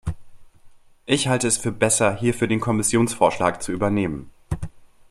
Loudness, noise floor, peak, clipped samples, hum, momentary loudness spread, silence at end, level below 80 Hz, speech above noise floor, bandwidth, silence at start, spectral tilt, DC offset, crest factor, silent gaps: -21 LUFS; -48 dBFS; -4 dBFS; under 0.1%; none; 15 LU; 0.25 s; -44 dBFS; 27 dB; 14.5 kHz; 0.05 s; -4.5 dB/octave; under 0.1%; 20 dB; none